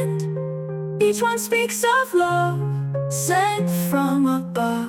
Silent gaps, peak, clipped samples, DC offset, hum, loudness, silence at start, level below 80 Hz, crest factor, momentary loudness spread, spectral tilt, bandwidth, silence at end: none; -8 dBFS; under 0.1%; under 0.1%; none; -21 LUFS; 0 s; -64 dBFS; 12 dB; 7 LU; -5 dB/octave; 17.5 kHz; 0 s